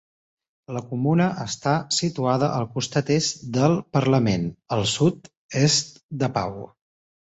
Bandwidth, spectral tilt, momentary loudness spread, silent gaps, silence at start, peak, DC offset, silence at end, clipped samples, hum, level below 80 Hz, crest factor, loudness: 8.2 kHz; -5 dB/octave; 12 LU; 5.37-5.49 s, 6.03-6.09 s; 0.7 s; -6 dBFS; under 0.1%; 0.55 s; under 0.1%; none; -54 dBFS; 18 dB; -23 LUFS